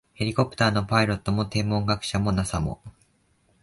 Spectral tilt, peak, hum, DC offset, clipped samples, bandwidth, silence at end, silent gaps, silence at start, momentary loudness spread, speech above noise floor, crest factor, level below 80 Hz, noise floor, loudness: -5.5 dB/octave; -6 dBFS; none; under 0.1%; under 0.1%; 11.5 kHz; 0.7 s; none; 0.2 s; 6 LU; 41 dB; 20 dB; -42 dBFS; -65 dBFS; -25 LUFS